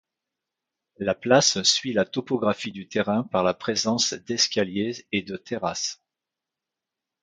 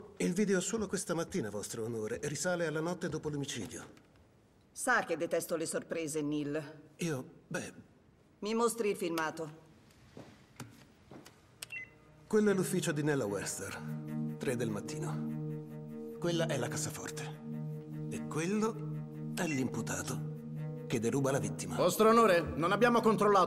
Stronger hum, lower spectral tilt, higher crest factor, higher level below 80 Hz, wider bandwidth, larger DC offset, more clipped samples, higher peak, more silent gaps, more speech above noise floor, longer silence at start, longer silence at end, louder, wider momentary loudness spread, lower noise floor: neither; second, -3 dB/octave vs -5 dB/octave; about the same, 22 dB vs 18 dB; first, -62 dBFS vs -68 dBFS; second, 11 kHz vs 16 kHz; neither; neither; first, -4 dBFS vs -16 dBFS; neither; first, 63 dB vs 32 dB; first, 1 s vs 0 s; first, 1.3 s vs 0 s; first, -24 LUFS vs -34 LUFS; second, 11 LU vs 16 LU; first, -87 dBFS vs -65 dBFS